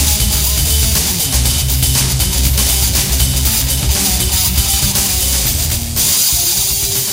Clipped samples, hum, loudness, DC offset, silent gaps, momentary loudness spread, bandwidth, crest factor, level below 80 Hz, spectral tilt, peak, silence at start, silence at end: under 0.1%; none; -12 LUFS; under 0.1%; none; 3 LU; 17 kHz; 14 dB; -18 dBFS; -2 dB/octave; 0 dBFS; 0 s; 0 s